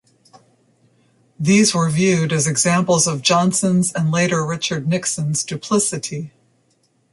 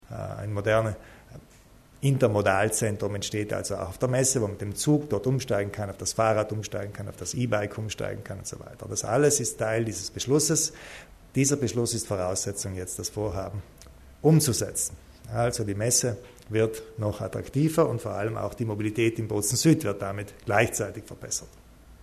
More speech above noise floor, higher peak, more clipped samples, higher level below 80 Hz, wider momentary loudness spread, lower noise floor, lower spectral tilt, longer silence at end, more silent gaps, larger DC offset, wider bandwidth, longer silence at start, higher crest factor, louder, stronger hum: first, 45 dB vs 27 dB; first, -2 dBFS vs -6 dBFS; neither; about the same, -56 dBFS vs -54 dBFS; second, 8 LU vs 12 LU; first, -62 dBFS vs -54 dBFS; about the same, -4 dB/octave vs -4.5 dB/octave; first, 0.85 s vs 0 s; neither; neither; second, 11.5 kHz vs 13.5 kHz; first, 1.4 s vs 0.1 s; second, 16 dB vs 22 dB; first, -17 LUFS vs -27 LUFS; neither